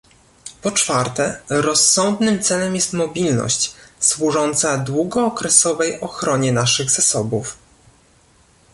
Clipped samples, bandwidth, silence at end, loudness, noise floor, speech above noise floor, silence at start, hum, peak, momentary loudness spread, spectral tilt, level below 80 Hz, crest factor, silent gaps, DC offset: under 0.1%; 12 kHz; 1.2 s; -17 LUFS; -53 dBFS; 35 dB; 0.45 s; none; 0 dBFS; 10 LU; -3 dB/octave; -52 dBFS; 20 dB; none; under 0.1%